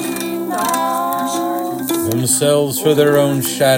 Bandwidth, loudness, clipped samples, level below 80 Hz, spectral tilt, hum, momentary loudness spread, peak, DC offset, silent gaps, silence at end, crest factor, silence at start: 17 kHz; -16 LUFS; under 0.1%; -60 dBFS; -4 dB/octave; none; 8 LU; 0 dBFS; under 0.1%; none; 0 s; 14 dB; 0 s